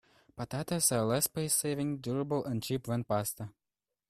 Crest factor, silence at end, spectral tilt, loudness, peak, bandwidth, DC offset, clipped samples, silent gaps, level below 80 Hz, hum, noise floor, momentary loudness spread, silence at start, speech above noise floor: 20 dB; 0.6 s; -4.5 dB/octave; -32 LUFS; -14 dBFS; 15.5 kHz; under 0.1%; under 0.1%; none; -64 dBFS; none; under -90 dBFS; 11 LU; 0.35 s; over 57 dB